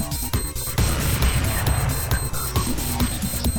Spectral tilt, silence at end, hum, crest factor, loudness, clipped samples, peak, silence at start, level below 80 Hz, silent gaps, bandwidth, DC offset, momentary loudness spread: -4 dB/octave; 0 s; none; 16 dB; -23 LUFS; under 0.1%; -8 dBFS; 0 s; -26 dBFS; none; over 20 kHz; 0.4%; 4 LU